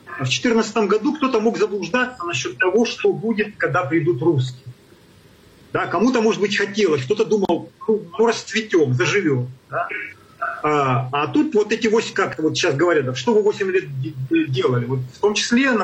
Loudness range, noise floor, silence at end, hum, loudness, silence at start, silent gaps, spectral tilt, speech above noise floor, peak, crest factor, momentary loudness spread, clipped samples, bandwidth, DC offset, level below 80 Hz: 2 LU; -49 dBFS; 0 s; none; -20 LUFS; 0.05 s; none; -5 dB/octave; 30 dB; -8 dBFS; 12 dB; 7 LU; under 0.1%; 8.8 kHz; under 0.1%; -60 dBFS